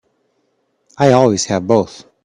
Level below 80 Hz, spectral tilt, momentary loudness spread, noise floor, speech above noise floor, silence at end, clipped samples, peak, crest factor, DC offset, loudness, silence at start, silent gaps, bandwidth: -54 dBFS; -5.5 dB/octave; 6 LU; -64 dBFS; 51 dB; 0.25 s; under 0.1%; 0 dBFS; 16 dB; under 0.1%; -14 LUFS; 1 s; none; 11 kHz